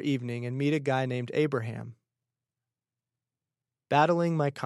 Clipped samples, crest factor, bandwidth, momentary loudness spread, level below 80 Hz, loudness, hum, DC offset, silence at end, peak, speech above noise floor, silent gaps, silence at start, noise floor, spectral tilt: under 0.1%; 22 dB; 12 kHz; 12 LU; -80 dBFS; -28 LUFS; none; under 0.1%; 0 s; -8 dBFS; over 62 dB; none; 0 s; under -90 dBFS; -7 dB/octave